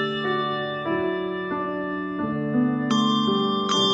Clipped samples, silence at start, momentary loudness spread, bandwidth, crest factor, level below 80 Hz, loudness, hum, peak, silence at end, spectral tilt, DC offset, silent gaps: under 0.1%; 0 s; 7 LU; 9.4 kHz; 14 dB; -60 dBFS; -24 LUFS; none; -10 dBFS; 0 s; -5 dB/octave; under 0.1%; none